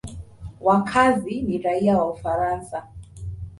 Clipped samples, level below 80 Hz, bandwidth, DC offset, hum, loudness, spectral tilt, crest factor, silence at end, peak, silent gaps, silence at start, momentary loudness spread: under 0.1%; -44 dBFS; 11.5 kHz; under 0.1%; none; -22 LUFS; -6.5 dB/octave; 18 dB; 0 s; -4 dBFS; none; 0.05 s; 19 LU